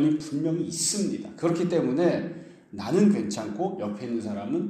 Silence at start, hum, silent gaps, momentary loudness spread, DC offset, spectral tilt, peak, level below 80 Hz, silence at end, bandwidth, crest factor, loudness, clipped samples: 0 s; none; none; 10 LU; under 0.1%; -5 dB/octave; -10 dBFS; -68 dBFS; 0 s; 14.5 kHz; 16 dB; -26 LUFS; under 0.1%